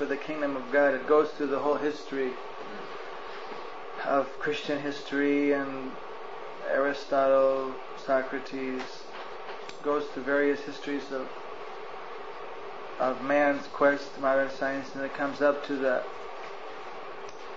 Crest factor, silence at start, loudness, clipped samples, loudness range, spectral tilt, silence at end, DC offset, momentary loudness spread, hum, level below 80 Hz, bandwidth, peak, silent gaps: 18 dB; 0 s; -29 LUFS; under 0.1%; 5 LU; -5 dB/octave; 0 s; 0.7%; 16 LU; none; -68 dBFS; 7.6 kHz; -12 dBFS; none